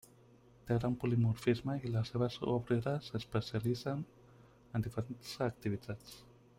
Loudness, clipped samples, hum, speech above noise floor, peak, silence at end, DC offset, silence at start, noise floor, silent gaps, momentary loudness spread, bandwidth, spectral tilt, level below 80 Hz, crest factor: -37 LUFS; under 0.1%; none; 27 dB; -18 dBFS; 0.35 s; under 0.1%; 0.65 s; -63 dBFS; none; 13 LU; 16 kHz; -7.5 dB/octave; -62 dBFS; 20 dB